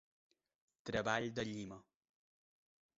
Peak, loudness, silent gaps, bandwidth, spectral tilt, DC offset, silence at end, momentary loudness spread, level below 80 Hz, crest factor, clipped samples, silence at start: -20 dBFS; -41 LUFS; none; 7.6 kHz; -3.5 dB/octave; under 0.1%; 1.15 s; 15 LU; -70 dBFS; 26 dB; under 0.1%; 0.85 s